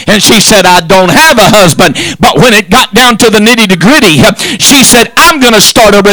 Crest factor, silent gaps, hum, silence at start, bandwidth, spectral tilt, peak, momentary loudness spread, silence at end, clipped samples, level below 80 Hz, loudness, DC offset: 4 dB; none; none; 0 s; over 20 kHz; -3 dB/octave; 0 dBFS; 4 LU; 0 s; 40%; -28 dBFS; -2 LUFS; under 0.1%